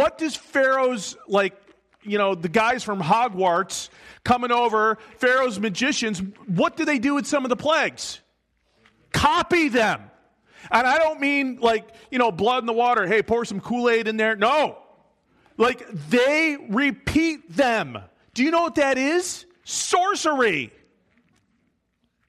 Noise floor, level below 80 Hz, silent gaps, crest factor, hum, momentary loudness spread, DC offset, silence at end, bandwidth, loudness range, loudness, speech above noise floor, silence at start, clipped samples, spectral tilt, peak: -71 dBFS; -54 dBFS; none; 20 dB; none; 10 LU; under 0.1%; 1.6 s; 13.5 kHz; 2 LU; -22 LUFS; 49 dB; 0 s; under 0.1%; -4 dB/octave; -2 dBFS